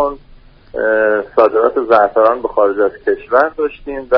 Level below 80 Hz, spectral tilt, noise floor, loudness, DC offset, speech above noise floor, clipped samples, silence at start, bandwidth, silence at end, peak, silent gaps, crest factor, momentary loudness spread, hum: -44 dBFS; -3 dB/octave; -41 dBFS; -14 LUFS; under 0.1%; 28 dB; under 0.1%; 0 s; 5.6 kHz; 0 s; 0 dBFS; none; 14 dB; 9 LU; none